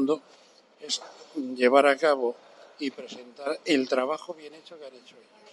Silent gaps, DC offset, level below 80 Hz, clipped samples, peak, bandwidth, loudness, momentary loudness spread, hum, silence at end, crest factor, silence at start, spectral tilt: none; under 0.1%; under -90 dBFS; under 0.1%; -6 dBFS; 11.5 kHz; -26 LUFS; 25 LU; none; 0.55 s; 22 dB; 0 s; -3 dB/octave